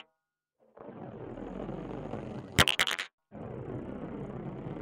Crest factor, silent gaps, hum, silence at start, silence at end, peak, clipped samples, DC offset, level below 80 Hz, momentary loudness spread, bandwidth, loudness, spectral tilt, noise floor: 26 dB; 3.13-3.18 s; none; 0.75 s; 0 s; -10 dBFS; under 0.1%; under 0.1%; -52 dBFS; 20 LU; 15 kHz; -33 LUFS; -3 dB/octave; -85 dBFS